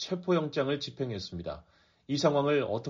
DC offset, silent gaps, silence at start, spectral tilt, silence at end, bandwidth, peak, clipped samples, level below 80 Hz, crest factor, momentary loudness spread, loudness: under 0.1%; none; 0 s; -5 dB/octave; 0 s; 7.4 kHz; -12 dBFS; under 0.1%; -62 dBFS; 18 dB; 13 LU; -30 LUFS